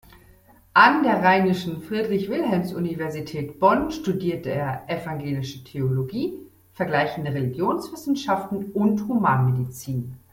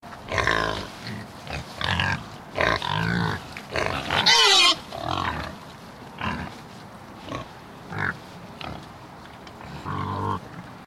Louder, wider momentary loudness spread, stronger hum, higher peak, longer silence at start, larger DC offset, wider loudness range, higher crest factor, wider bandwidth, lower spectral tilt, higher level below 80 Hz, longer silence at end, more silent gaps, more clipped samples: about the same, -23 LUFS vs -23 LUFS; second, 12 LU vs 24 LU; neither; about the same, -2 dBFS vs -4 dBFS; first, 0.75 s vs 0.05 s; neither; second, 6 LU vs 14 LU; about the same, 22 dB vs 24 dB; about the same, 17 kHz vs 16.5 kHz; first, -7 dB/octave vs -3 dB/octave; second, -56 dBFS vs -48 dBFS; first, 0.15 s vs 0 s; neither; neither